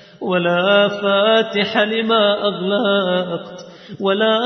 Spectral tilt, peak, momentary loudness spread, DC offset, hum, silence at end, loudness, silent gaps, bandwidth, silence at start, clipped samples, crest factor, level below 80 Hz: -6 dB/octave; -2 dBFS; 12 LU; under 0.1%; none; 0 s; -16 LUFS; none; 6.2 kHz; 0.2 s; under 0.1%; 14 dB; -66 dBFS